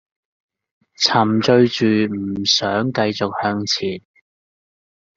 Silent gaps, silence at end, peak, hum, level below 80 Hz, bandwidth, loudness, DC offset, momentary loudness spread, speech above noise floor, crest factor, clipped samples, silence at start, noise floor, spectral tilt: none; 1.15 s; -2 dBFS; none; -60 dBFS; 7.8 kHz; -18 LUFS; under 0.1%; 7 LU; over 72 dB; 18 dB; under 0.1%; 1 s; under -90 dBFS; -4.5 dB/octave